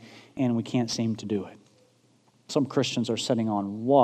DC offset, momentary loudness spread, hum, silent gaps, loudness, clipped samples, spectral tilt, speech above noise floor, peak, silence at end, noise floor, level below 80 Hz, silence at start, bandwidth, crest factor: under 0.1%; 6 LU; none; none; -28 LUFS; under 0.1%; -5.5 dB/octave; 38 dB; -6 dBFS; 0 s; -63 dBFS; -70 dBFS; 0 s; 13 kHz; 22 dB